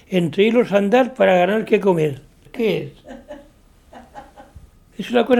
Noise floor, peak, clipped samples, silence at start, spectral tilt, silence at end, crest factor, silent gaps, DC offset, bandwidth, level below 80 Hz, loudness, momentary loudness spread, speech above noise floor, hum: -50 dBFS; 0 dBFS; under 0.1%; 0.1 s; -7 dB/octave; 0 s; 18 dB; none; under 0.1%; 15.5 kHz; -52 dBFS; -18 LUFS; 21 LU; 33 dB; none